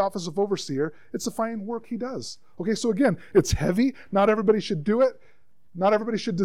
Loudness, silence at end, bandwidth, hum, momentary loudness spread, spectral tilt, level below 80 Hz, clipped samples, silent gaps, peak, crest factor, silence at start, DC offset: -25 LUFS; 0 s; 16 kHz; none; 11 LU; -5.5 dB/octave; -46 dBFS; under 0.1%; none; -8 dBFS; 18 dB; 0 s; 0.5%